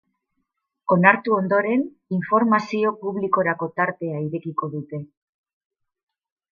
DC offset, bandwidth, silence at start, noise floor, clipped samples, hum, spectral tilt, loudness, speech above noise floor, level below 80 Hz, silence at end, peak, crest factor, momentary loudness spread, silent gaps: under 0.1%; 7.2 kHz; 0.9 s; -76 dBFS; under 0.1%; none; -8.5 dB/octave; -21 LUFS; 55 dB; -72 dBFS; 1.5 s; 0 dBFS; 22 dB; 13 LU; none